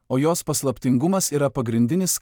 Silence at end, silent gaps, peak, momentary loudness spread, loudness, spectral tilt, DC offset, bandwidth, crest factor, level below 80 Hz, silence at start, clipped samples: 0.05 s; none; -8 dBFS; 3 LU; -21 LUFS; -5 dB/octave; under 0.1%; 19 kHz; 12 dB; -54 dBFS; 0.1 s; under 0.1%